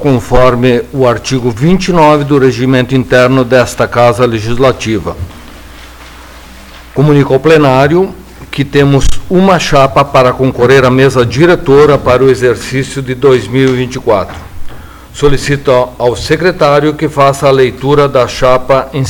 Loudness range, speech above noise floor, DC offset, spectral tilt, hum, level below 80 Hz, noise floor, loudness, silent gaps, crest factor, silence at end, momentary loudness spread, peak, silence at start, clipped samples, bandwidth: 5 LU; 23 dB; under 0.1%; -6 dB/octave; none; -26 dBFS; -31 dBFS; -8 LUFS; none; 8 dB; 0 s; 7 LU; 0 dBFS; 0 s; 3%; 19.5 kHz